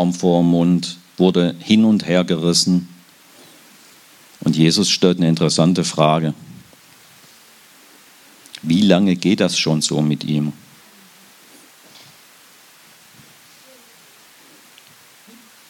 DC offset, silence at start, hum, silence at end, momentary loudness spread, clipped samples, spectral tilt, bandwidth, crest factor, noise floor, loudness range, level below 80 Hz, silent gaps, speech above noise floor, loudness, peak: under 0.1%; 0 s; none; 5.15 s; 9 LU; under 0.1%; -5 dB/octave; 16.5 kHz; 20 dB; -47 dBFS; 6 LU; -62 dBFS; none; 32 dB; -16 LUFS; 0 dBFS